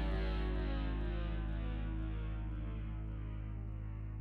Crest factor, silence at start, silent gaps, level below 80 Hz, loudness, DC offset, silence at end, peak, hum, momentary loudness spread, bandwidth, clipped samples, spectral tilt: 12 dB; 0 s; none; -40 dBFS; -42 LUFS; under 0.1%; 0 s; -26 dBFS; none; 6 LU; 4.6 kHz; under 0.1%; -9 dB/octave